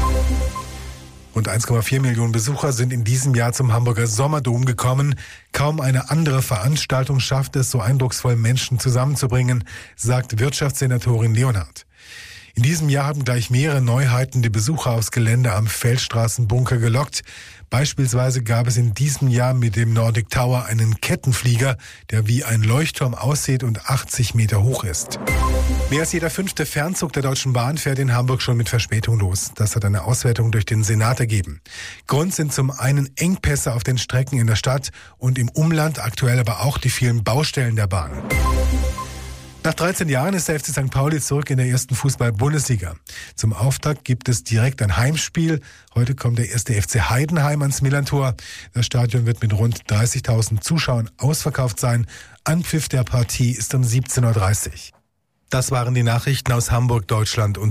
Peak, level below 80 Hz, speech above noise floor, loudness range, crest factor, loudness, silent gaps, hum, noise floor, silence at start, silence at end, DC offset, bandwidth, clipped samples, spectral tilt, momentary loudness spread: -8 dBFS; -34 dBFS; 48 dB; 2 LU; 10 dB; -20 LUFS; none; none; -67 dBFS; 0 s; 0 s; under 0.1%; 15.5 kHz; under 0.1%; -5 dB/octave; 6 LU